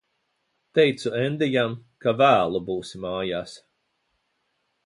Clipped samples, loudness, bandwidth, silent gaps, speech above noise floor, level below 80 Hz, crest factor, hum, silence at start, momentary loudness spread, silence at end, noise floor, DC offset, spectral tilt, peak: under 0.1%; -23 LUFS; 11.5 kHz; none; 51 dB; -60 dBFS; 20 dB; none; 0.75 s; 13 LU; 1.3 s; -74 dBFS; under 0.1%; -6 dB/octave; -6 dBFS